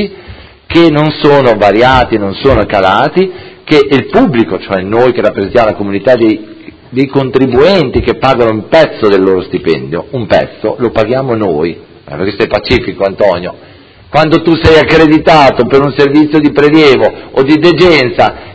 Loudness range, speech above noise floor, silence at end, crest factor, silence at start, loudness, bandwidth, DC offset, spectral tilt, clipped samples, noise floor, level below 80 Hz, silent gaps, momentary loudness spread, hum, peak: 6 LU; 24 dB; 0 s; 8 dB; 0 s; -8 LUFS; 8 kHz; under 0.1%; -7 dB/octave; 3%; -31 dBFS; -30 dBFS; none; 9 LU; none; 0 dBFS